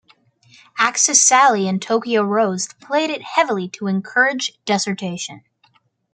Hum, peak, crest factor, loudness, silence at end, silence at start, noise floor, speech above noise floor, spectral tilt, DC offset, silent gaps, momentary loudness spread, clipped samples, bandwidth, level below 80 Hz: none; 0 dBFS; 20 dB; -17 LUFS; 0.75 s; 0.75 s; -60 dBFS; 41 dB; -2.5 dB/octave; under 0.1%; none; 13 LU; under 0.1%; 10.5 kHz; -70 dBFS